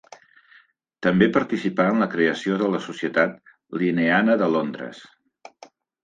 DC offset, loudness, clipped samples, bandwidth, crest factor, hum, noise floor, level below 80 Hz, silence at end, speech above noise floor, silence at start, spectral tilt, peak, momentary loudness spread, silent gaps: under 0.1%; -22 LUFS; under 0.1%; 9 kHz; 20 dB; none; -56 dBFS; -62 dBFS; 1 s; 35 dB; 1 s; -7 dB/octave; -4 dBFS; 8 LU; none